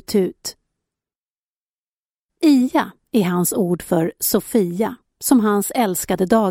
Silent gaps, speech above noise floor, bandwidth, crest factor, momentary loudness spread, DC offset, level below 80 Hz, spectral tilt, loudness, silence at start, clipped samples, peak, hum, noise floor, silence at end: 1.20-2.29 s; over 72 dB; 16.5 kHz; 18 dB; 9 LU; under 0.1%; -54 dBFS; -5 dB/octave; -19 LUFS; 0.1 s; under 0.1%; -2 dBFS; none; under -90 dBFS; 0 s